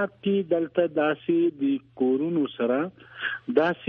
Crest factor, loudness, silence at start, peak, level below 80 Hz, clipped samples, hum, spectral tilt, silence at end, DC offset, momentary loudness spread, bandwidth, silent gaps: 18 dB; -26 LUFS; 0 s; -8 dBFS; -70 dBFS; under 0.1%; none; -9 dB/octave; 0 s; under 0.1%; 6 LU; 5 kHz; none